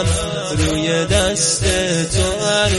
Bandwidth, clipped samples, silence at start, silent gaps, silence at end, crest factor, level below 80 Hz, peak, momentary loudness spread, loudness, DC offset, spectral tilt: 11.5 kHz; under 0.1%; 0 s; none; 0 s; 16 dB; -28 dBFS; -2 dBFS; 4 LU; -17 LUFS; under 0.1%; -3.5 dB/octave